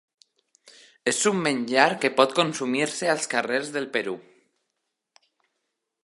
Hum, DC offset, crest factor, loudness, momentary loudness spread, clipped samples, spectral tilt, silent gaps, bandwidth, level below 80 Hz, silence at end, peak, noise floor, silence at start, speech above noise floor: none; under 0.1%; 26 dB; -24 LUFS; 8 LU; under 0.1%; -3 dB/octave; none; 11.5 kHz; -76 dBFS; 1.8 s; -2 dBFS; -80 dBFS; 0.65 s; 57 dB